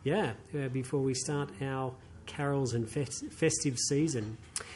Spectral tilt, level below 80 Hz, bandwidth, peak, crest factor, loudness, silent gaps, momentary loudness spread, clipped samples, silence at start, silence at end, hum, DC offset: -4.5 dB/octave; -58 dBFS; 11.5 kHz; -16 dBFS; 18 dB; -33 LUFS; none; 9 LU; under 0.1%; 0 s; 0 s; none; under 0.1%